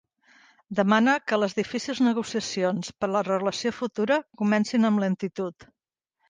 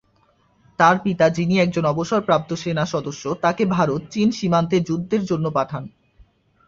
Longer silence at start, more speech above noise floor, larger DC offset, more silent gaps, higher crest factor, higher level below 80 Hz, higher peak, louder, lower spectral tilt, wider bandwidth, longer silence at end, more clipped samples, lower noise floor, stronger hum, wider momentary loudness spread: about the same, 0.7 s vs 0.8 s; first, 58 dB vs 41 dB; neither; neither; about the same, 18 dB vs 18 dB; second, -68 dBFS vs -54 dBFS; second, -8 dBFS vs -2 dBFS; second, -25 LUFS vs -20 LUFS; second, -5 dB/octave vs -6.5 dB/octave; first, 9.6 kHz vs 7.6 kHz; second, 0.65 s vs 0.8 s; neither; first, -83 dBFS vs -61 dBFS; neither; about the same, 8 LU vs 8 LU